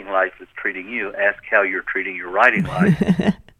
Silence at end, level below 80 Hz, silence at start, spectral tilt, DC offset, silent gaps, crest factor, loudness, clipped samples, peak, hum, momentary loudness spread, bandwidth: 0.25 s; -48 dBFS; 0 s; -7.5 dB/octave; under 0.1%; none; 20 dB; -19 LUFS; under 0.1%; 0 dBFS; none; 10 LU; 10.5 kHz